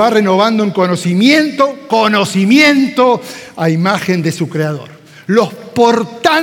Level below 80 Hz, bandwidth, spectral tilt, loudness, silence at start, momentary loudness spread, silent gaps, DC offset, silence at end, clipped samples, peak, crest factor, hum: -60 dBFS; 17.5 kHz; -5.5 dB/octave; -12 LUFS; 0 s; 9 LU; none; under 0.1%; 0 s; under 0.1%; 0 dBFS; 12 dB; none